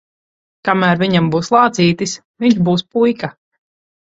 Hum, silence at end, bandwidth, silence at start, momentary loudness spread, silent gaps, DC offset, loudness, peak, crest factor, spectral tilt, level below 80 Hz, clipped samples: none; 0.8 s; 7.8 kHz; 0.65 s; 10 LU; 2.25-2.34 s; under 0.1%; -15 LUFS; 0 dBFS; 16 dB; -5.5 dB/octave; -54 dBFS; under 0.1%